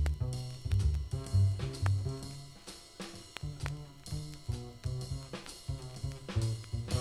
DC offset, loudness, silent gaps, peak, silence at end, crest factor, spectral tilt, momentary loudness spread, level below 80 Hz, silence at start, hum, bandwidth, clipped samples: under 0.1%; -37 LUFS; none; -14 dBFS; 0 s; 22 dB; -5.5 dB/octave; 14 LU; -42 dBFS; 0 s; none; 13 kHz; under 0.1%